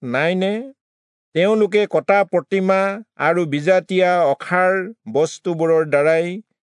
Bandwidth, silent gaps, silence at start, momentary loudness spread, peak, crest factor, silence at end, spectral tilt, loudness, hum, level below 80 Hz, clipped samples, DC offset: 10.5 kHz; 0.81-1.32 s; 0 s; 7 LU; -4 dBFS; 16 dB; 0.4 s; -6 dB/octave; -18 LUFS; none; -76 dBFS; under 0.1%; under 0.1%